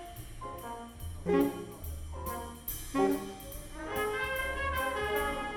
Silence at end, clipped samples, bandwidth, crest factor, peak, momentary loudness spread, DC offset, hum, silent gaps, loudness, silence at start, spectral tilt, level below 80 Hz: 0 s; under 0.1%; over 20 kHz; 20 dB; -14 dBFS; 14 LU; under 0.1%; none; none; -35 LUFS; 0 s; -4.5 dB/octave; -46 dBFS